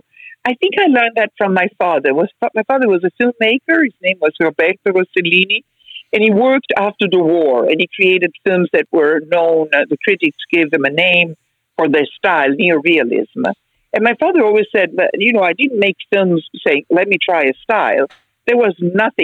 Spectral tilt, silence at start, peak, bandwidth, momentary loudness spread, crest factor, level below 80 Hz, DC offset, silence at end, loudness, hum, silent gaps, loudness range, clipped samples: -7 dB/octave; 0.2 s; 0 dBFS; 7.6 kHz; 6 LU; 14 dB; -66 dBFS; under 0.1%; 0 s; -14 LUFS; none; none; 1 LU; under 0.1%